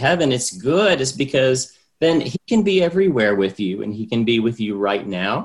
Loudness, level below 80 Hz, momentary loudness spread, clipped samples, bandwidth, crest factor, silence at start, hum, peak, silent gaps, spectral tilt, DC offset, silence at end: -19 LUFS; -54 dBFS; 7 LU; under 0.1%; 12 kHz; 16 dB; 0 s; none; -4 dBFS; none; -4.5 dB/octave; under 0.1%; 0 s